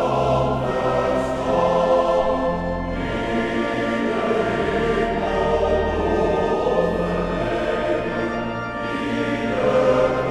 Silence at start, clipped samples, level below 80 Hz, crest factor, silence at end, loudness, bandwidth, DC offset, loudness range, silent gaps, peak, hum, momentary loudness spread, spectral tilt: 0 s; under 0.1%; -36 dBFS; 14 dB; 0 s; -21 LUFS; 11.5 kHz; under 0.1%; 2 LU; none; -6 dBFS; none; 7 LU; -6.5 dB/octave